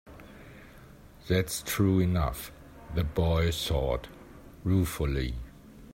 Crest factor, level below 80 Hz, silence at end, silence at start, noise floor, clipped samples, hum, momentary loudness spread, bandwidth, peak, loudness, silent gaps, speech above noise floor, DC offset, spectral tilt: 16 dB; -40 dBFS; 0 s; 0.05 s; -51 dBFS; under 0.1%; none; 24 LU; 16 kHz; -14 dBFS; -29 LUFS; none; 24 dB; under 0.1%; -5.5 dB/octave